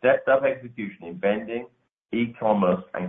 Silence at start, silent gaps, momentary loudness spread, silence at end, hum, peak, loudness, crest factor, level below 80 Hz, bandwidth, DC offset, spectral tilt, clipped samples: 0.05 s; 1.93-2.05 s; 14 LU; 0 s; none; -6 dBFS; -25 LUFS; 18 dB; -64 dBFS; 3.8 kHz; under 0.1%; -9.5 dB/octave; under 0.1%